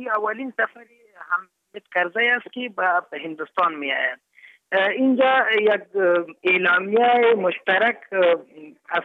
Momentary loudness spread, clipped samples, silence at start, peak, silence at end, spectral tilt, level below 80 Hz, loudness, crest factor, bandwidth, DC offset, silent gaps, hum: 10 LU; under 0.1%; 0 s; -8 dBFS; 0 s; -6.5 dB/octave; -82 dBFS; -21 LUFS; 14 dB; 4.6 kHz; under 0.1%; none; none